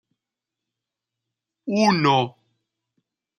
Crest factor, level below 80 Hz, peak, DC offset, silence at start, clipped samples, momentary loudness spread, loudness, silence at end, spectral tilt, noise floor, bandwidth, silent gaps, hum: 22 dB; -70 dBFS; -4 dBFS; under 0.1%; 1.65 s; under 0.1%; 14 LU; -20 LUFS; 1.1 s; -5.5 dB/octave; -86 dBFS; 9.8 kHz; none; none